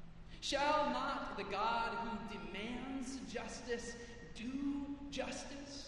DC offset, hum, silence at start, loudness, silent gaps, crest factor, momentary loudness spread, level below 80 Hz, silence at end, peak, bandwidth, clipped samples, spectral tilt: under 0.1%; none; 0 s; -41 LUFS; none; 20 dB; 12 LU; -58 dBFS; 0 s; -22 dBFS; 11.5 kHz; under 0.1%; -3.5 dB/octave